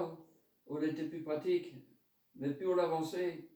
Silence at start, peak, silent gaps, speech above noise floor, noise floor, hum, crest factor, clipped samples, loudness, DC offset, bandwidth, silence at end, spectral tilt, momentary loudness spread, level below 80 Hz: 0 s; -20 dBFS; none; 27 dB; -63 dBFS; none; 18 dB; under 0.1%; -37 LUFS; under 0.1%; over 20 kHz; 0.05 s; -6.5 dB/octave; 11 LU; -86 dBFS